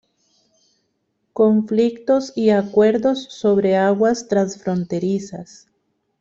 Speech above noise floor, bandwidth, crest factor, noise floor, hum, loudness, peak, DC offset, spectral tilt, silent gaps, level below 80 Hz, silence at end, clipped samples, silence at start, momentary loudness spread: 53 dB; 7.8 kHz; 16 dB; -71 dBFS; none; -18 LUFS; -4 dBFS; under 0.1%; -6.5 dB/octave; none; -62 dBFS; 0.75 s; under 0.1%; 1.35 s; 8 LU